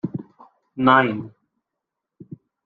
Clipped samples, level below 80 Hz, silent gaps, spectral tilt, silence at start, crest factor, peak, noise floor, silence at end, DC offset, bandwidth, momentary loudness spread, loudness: under 0.1%; -64 dBFS; none; -8.5 dB/octave; 0.05 s; 22 dB; -2 dBFS; -83 dBFS; 1.35 s; under 0.1%; 4.6 kHz; 24 LU; -19 LUFS